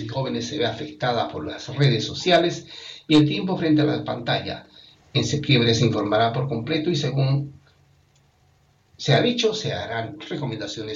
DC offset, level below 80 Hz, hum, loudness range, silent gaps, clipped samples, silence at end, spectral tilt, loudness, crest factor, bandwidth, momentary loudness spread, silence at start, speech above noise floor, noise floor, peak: under 0.1%; -56 dBFS; none; 4 LU; none; under 0.1%; 0 s; -5.5 dB/octave; -22 LUFS; 18 dB; 8.2 kHz; 12 LU; 0 s; 38 dB; -60 dBFS; -4 dBFS